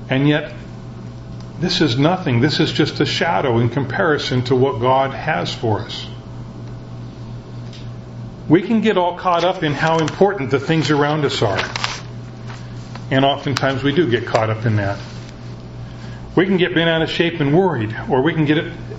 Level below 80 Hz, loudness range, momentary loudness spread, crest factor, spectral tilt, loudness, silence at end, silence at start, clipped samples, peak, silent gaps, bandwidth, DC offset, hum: -44 dBFS; 5 LU; 17 LU; 18 dB; -6 dB/octave; -17 LUFS; 0 s; 0 s; under 0.1%; 0 dBFS; none; 8 kHz; under 0.1%; none